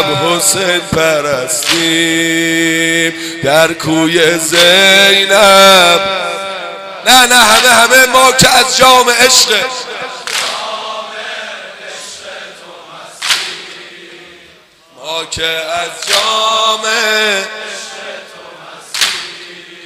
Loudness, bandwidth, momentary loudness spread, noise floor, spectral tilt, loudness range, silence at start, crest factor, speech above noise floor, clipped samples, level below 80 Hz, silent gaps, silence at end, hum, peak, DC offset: -8 LUFS; over 20 kHz; 21 LU; -43 dBFS; -1.5 dB/octave; 14 LU; 0 s; 12 dB; 34 dB; 0.5%; -44 dBFS; none; 0 s; none; 0 dBFS; under 0.1%